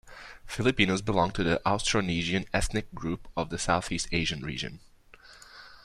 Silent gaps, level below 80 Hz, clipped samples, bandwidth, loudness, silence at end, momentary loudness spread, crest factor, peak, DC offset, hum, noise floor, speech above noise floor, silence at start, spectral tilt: none; -44 dBFS; under 0.1%; 13.5 kHz; -29 LUFS; 0.05 s; 15 LU; 22 dB; -6 dBFS; under 0.1%; none; -54 dBFS; 25 dB; 0.05 s; -4.5 dB/octave